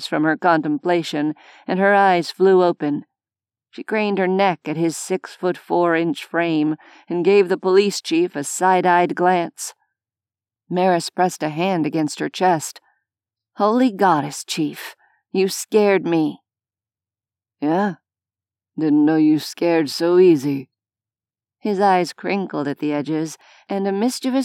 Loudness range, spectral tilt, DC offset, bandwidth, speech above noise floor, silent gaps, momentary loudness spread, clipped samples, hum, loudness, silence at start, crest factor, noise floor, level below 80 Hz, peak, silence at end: 4 LU; -5 dB/octave; under 0.1%; 16 kHz; over 72 dB; none; 11 LU; under 0.1%; none; -19 LUFS; 0 s; 16 dB; under -90 dBFS; -90 dBFS; -4 dBFS; 0 s